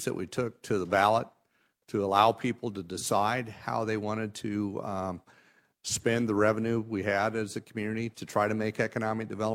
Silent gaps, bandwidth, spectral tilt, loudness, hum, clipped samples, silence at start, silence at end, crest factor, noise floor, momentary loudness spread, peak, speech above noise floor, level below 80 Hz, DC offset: none; 16 kHz; -5 dB/octave; -30 LUFS; none; under 0.1%; 0 s; 0 s; 22 dB; -73 dBFS; 11 LU; -8 dBFS; 43 dB; -66 dBFS; under 0.1%